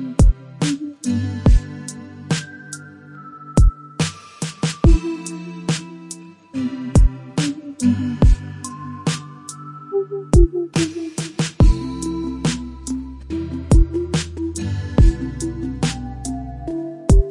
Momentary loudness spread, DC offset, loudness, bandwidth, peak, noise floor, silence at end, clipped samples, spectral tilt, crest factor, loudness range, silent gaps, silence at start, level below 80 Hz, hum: 16 LU; under 0.1%; -21 LUFS; 11.5 kHz; -2 dBFS; -39 dBFS; 0 s; under 0.1%; -6 dB/octave; 18 dB; 2 LU; none; 0 s; -22 dBFS; none